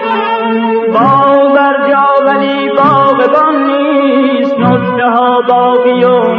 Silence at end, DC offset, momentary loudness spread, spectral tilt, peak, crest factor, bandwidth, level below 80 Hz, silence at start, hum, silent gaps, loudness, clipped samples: 0 s; under 0.1%; 4 LU; -8.5 dB/octave; 0 dBFS; 8 dB; 5.6 kHz; -54 dBFS; 0 s; none; none; -9 LUFS; under 0.1%